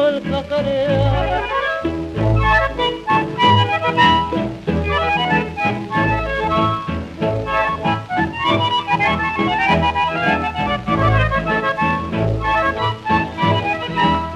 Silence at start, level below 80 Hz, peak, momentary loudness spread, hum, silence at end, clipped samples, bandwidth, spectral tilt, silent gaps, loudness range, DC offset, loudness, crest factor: 0 s; -32 dBFS; -2 dBFS; 6 LU; none; 0 s; under 0.1%; 9.6 kHz; -6.5 dB/octave; none; 3 LU; under 0.1%; -18 LUFS; 16 dB